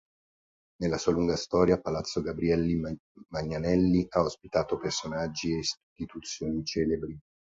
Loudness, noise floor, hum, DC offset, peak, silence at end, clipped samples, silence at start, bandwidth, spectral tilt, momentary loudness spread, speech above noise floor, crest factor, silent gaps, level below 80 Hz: -29 LUFS; under -90 dBFS; none; under 0.1%; -10 dBFS; 0.25 s; under 0.1%; 0.8 s; 8 kHz; -5.5 dB/octave; 13 LU; over 61 dB; 20 dB; 2.99-3.15 s, 5.83-5.96 s; -50 dBFS